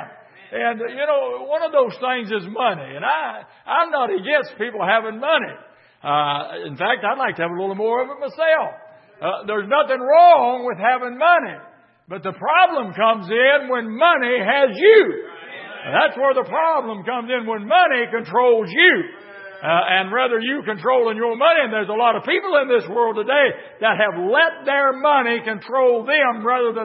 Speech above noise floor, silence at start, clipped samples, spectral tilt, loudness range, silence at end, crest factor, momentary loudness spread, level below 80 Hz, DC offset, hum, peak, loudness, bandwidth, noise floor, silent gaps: 23 dB; 0 s; under 0.1%; -9 dB/octave; 5 LU; 0 s; 18 dB; 11 LU; -78 dBFS; under 0.1%; none; 0 dBFS; -18 LUFS; 5.8 kHz; -41 dBFS; none